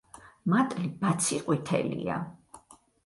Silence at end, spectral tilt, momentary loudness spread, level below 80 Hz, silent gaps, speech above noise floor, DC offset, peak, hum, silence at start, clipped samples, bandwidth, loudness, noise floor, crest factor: 0.3 s; -5 dB/octave; 9 LU; -64 dBFS; none; 29 dB; under 0.1%; -12 dBFS; none; 0.25 s; under 0.1%; 11.5 kHz; -29 LUFS; -57 dBFS; 18 dB